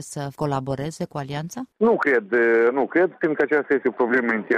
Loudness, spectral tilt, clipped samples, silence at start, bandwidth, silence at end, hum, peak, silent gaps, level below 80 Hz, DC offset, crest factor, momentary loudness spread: -22 LUFS; -6.5 dB/octave; under 0.1%; 0 s; 13 kHz; 0 s; none; -8 dBFS; none; -58 dBFS; under 0.1%; 14 dB; 12 LU